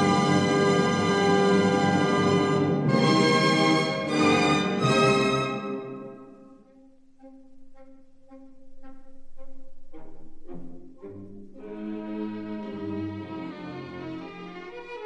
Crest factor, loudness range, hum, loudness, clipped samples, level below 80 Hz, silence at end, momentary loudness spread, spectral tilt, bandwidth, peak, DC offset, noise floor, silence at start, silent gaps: 18 dB; 18 LU; none; -23 LUFS; under 0.1%; -52 dBFS; 0 s; 23 LU; -5.5 dB/octave; 11 kHz; -8 dBFS; under 0.1%; -53 dBFS; 0 s; none